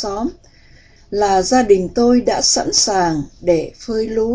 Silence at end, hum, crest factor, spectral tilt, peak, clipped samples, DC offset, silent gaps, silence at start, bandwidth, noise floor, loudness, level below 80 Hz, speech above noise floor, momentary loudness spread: 0 s; none; 16 dB; -3 dB/octave; 0 dBFS; under 0.1%; under 0.1%; none; 0 s; 8 kHz; -46 dBFS; -16 LUFS; -42 dBFS; 30 dB; 10 LU